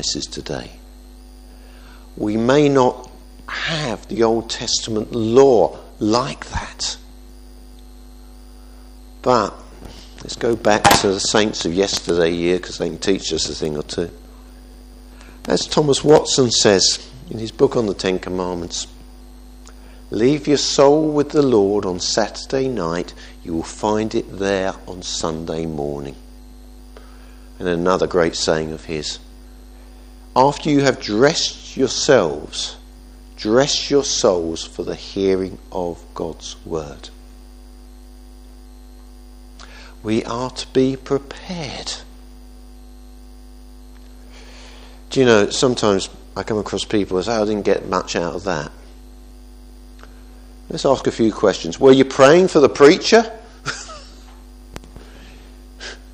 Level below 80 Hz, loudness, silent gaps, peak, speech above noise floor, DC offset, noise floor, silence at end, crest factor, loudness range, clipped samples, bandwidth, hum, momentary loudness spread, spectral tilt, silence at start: -40 dBFS; -18 LUFS; none; 0 dBFS; 22 dB; under 0.1%; -40 dBFS; 0 s; 20 dB; 10 LU; under 0.1%; 15.5 kHz; none; 17 LU; -4 dB/octave; 0 s